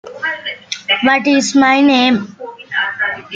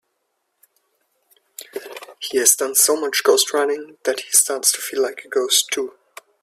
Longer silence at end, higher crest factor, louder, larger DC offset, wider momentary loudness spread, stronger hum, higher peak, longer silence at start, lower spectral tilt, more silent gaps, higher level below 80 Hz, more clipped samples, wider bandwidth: second, 0 s vs 0.55 s; second, 14 dB vs 22 dB; first, -14 LUFS vs -17 LUFS; neither; second, 14 LU vs 19 LU; neither; about the same, -2 dBFS vs 0 dBFS; second, 0.05 s vs 1.6 s; first, -3 dB/octave vs 1.5 dB/octave; neither; first, -58 dBFS vs -72 dBFS; neither; second, 9.2 kHz vs 16 kHz